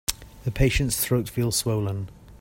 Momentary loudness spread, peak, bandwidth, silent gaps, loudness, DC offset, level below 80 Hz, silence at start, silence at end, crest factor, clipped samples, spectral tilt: 11 LU; -6 dBFS; 16.5 kHz; none; -25 LUFS; under 0.1%; -36 dBFS; 0.1 s; 0.05 s; 20 dB; under 0.1%; -4.5 dB/octave